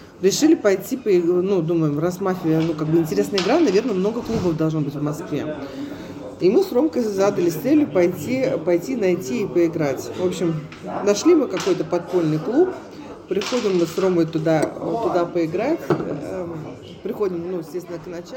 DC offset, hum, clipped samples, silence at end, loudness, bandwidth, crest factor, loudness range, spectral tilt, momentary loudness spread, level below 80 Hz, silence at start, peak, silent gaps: under 0.1%; none; under 0.1%; 0 s; -21 LUFS; 17 kHz; 16 dB; 3 LU; -6 dB/octave; 13 LU; -54 dBFS; 0 s; -4 dBFS; none